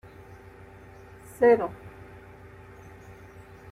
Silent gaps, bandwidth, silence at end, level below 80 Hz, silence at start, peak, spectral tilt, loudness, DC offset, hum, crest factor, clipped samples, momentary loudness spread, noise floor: none; 13.5 kHz; 1.85 s; -58 dBFS; 1.4 s; -8 dBFS; -7 dB/octave; -23 LUFS; under 0.1%; none; 22 dB; under 0.1%; 28 LU; -48 dBFS